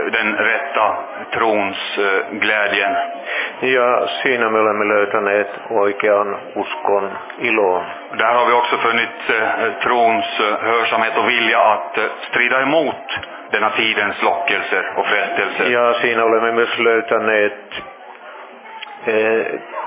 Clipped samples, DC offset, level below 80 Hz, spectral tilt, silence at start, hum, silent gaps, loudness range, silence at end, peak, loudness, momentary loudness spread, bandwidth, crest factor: under 0.1%; under 0.1%; -64 dBFS; -7 dB/octave; 0 s; none; none; 2 LU; 0 s; 0 dBFS; -16 LUFS; 10 LU; 4 kHz; 18 dB